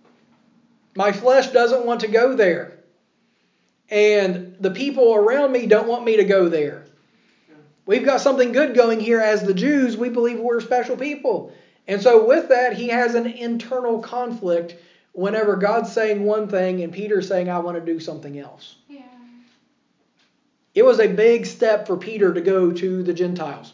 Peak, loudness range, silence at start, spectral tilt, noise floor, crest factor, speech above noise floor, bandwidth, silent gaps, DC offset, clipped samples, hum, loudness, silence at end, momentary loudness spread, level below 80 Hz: 0 dBFS; 5 LU; 0.95 s; -6 dB/octave; -66 dBFS; 18 dB; 47 dB; 7.6 kHz; none; under 0.1%; under 0.1%; none; -19 LUFS; 0.05 s; 11 LU; -88 dBFS